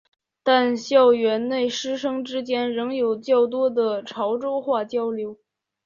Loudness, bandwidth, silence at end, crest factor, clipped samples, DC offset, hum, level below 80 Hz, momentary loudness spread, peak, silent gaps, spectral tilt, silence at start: -22 LUFS; 7.4 kHz; 0.5 s; 18 dB; under 0.1%; under 0.1%; none; -70 dBFS; 9 LU; -4 dBFS; none; -4 dB/octave; 0.45 s